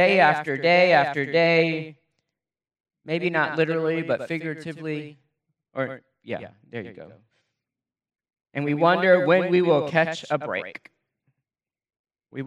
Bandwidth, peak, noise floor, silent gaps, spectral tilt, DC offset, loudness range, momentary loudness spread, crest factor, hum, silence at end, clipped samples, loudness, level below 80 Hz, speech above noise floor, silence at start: 10 kHz; -4 dBFS; under -90 dBFS; 2.80-2.84 s, 11.99-12.04 s; -6.5 dB/octave; under 0.1%; 13 LU; 19 LU; 20 dB; none; 0 s; under 0.1%; -22 LUFS; -76 dBFS; over 68 dB; 0 s